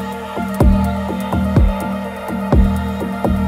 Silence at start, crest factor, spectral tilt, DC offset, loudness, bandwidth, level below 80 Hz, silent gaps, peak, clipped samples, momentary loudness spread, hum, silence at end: 0 s; 16 dB; -8 dB/octave; under 0.1%; -18 LUFS; 16 kHz; -20 dBFS; none; 0 dBFS; under 0.1%; 9 LU; none; 0 s